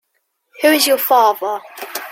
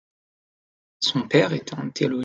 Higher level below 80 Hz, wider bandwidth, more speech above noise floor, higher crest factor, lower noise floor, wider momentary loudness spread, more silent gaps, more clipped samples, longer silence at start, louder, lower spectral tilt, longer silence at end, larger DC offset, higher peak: about the same, -70 dBFS vs -66 dBFS; first, 16.5 kHz vs 9 kHz; second, 55 dB vs over 67 dB; second, 16 dB vs 22 dB; second, -69 dBFS vs under -90 dBFS; first, 15 LU vs 9 LU; neither; neither; second, 0.6 s vs 1 s; first, -14 LUFS vs -23 LUFS; second, -0.5 dB/octave vs -5 dB/octave; about the same, 0 s vs 0 s; neither; first, 0 dBFS vs -4 dBFS